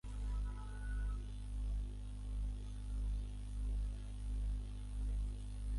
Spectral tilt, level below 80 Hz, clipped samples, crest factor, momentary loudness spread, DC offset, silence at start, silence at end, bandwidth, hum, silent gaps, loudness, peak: -6.5 dB/octave; -42 dBFS; under 0.1%; 8 dB; 4 LU; under 0.1%; 0.05 s; 0 s; 11.5 kHz; 50 Hz at -40 dBFS; none; -45 LUFS; -32 dBFS